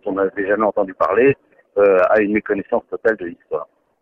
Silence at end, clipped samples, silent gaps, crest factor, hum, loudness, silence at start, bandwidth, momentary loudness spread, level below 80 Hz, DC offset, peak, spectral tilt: 0.4 s; under 0.1%; none; 14 dB; none; -18 LUFS; 0.05 s; 5.4 kHz; 13 LU; -54 dBFS; under 0.1%; -4 dBFS; -8.5 dB/octave